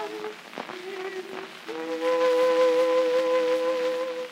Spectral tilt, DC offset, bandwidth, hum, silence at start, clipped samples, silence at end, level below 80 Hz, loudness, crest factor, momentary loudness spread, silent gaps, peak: -3 dB/octave; under 0.1%; 15 kHz; none; 0 s; under 0.1%; 0 s; -86 dBFS; -25 LUFS; 14 dB; 16 LU; none; -12 dBFS